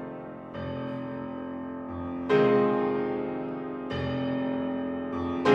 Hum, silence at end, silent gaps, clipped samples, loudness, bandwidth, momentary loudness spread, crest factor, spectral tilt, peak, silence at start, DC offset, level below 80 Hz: none; 0 s; none; under 0.1%; -30 LUFS; 7.8 kHz; 13 LU; 20 dB; -8 dB/octave; -10 dBFS; 0 s; under 0.1%; -56 dBFS